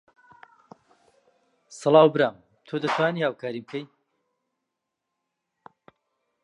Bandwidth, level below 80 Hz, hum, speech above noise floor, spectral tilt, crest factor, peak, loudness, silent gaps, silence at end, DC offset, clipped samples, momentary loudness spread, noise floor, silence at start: 11 kHz; -80 dBFS; none; 60 dB; -6 dB/octave; 24 dB; -4 dBFS; -23 LUFS; none; 2.6 s; under 0.1%; under 0.1%; 17 LU; -83 dBFS; 1.7 s